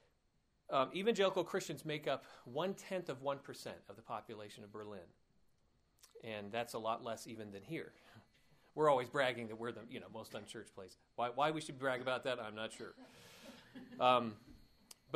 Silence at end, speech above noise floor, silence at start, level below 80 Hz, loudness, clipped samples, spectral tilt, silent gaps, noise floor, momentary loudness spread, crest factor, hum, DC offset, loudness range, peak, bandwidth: 0 s; 38 dB; 0.7 s; -78 dBFS; -40 LUFS; under 0.1%; -4.5 dB/octave; none; -78 dBFS; 21 LU; 24 dB; none; under 0.1%; 8 LU; -18 dBFS; 15.5 kHz